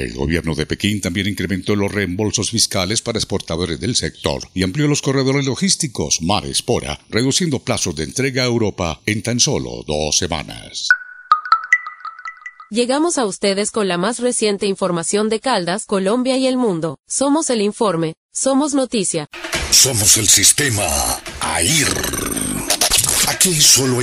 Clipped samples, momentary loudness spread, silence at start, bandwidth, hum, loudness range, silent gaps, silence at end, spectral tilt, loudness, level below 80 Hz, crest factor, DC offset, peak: under 0.1%; 11 LU; 0 s; 16 kHz; none; 5 LU; 18.17-18.29 s; 0 s; -3 dB/octave; -16 LUFS; -40 dBFS; 18 dB; under 0.1%; 0 dBFS